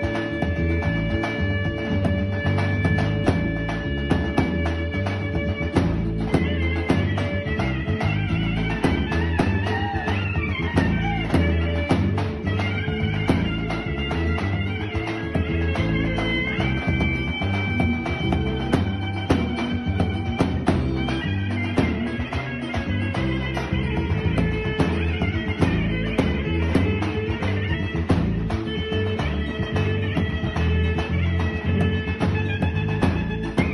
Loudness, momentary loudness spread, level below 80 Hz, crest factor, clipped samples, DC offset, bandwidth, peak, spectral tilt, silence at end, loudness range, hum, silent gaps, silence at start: -23 LUFS; 4 LU; -32 dBFS; 16 dB; under 0.1%; under 0.1%; 11.5 kHz; -6 dBFS; -7.5 dB/octave; 0 s; 1 LU; none; none; 0 s